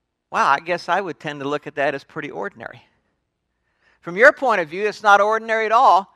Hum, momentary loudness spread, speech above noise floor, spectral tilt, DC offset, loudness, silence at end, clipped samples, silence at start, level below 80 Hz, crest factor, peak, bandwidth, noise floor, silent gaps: none; 17 LU; 55 dB; -4 dB/octave; under 0.1%; -18 LUFS; 0.1 s; under 0.1%; 0.3 s; -68 dBFS; 20 dB; 0 dBFS; 12.5 kHz; -74 dBFS; none